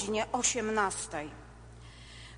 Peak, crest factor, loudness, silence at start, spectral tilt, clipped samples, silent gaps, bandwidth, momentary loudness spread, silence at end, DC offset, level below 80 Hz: -14 dBFS; 20 dB; -31 LUFS; 0 s; -2 dB/octave; under 0.1%; none; 10 kHz; 23 LU; 0 s; under 0.1%; -54 dBFS